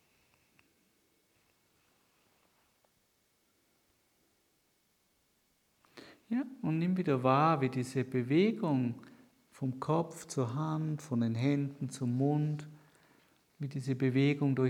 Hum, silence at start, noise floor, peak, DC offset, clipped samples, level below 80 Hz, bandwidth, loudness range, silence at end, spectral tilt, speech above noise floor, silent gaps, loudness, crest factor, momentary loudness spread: none; 5.95 s; -75 dBFS; -14 dBFS; under 0.1%; under 0.1%; -80 dBFS; 13.5 kHz; 6 LU; 0 s; -7.5 dB/octave; 43 dB; none; -33 LUFS; 22 dB; 10 LU